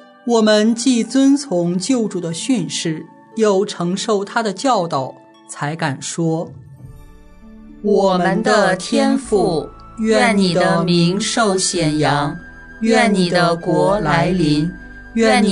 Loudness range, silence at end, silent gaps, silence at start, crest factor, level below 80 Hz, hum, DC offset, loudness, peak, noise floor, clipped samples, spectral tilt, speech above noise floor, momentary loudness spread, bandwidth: 5 LU; 0 s; none; 0.25 s; 16 dB; -44 dBFS; none; under 0.1%; -17 LUFS; 0 dBFS; -40 dBFS; under 0.1%; -5 dB/octave; 24 dB; 11 LU; 11 kHz